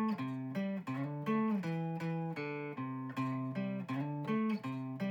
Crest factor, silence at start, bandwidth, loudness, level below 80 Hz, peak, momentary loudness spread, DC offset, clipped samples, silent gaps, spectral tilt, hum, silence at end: 12 dB; 0 s; 16 kHz; -38 LUFS; -86 dBFS; -24 dBFS; 6 LU; under 0.1%; under 0.1%; none; -8.5 dB/octave; none; 0 s